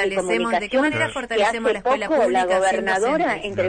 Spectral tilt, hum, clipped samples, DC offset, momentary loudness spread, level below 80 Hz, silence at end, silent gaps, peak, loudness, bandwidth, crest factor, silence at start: -4 dB/octave; none; under 0.1%; under 0.1%; 3 LU; -50 dBFS; 0 s; none; -8 dBFS; -20 LUFS; 9.6 kHz; 12 dB; 0 s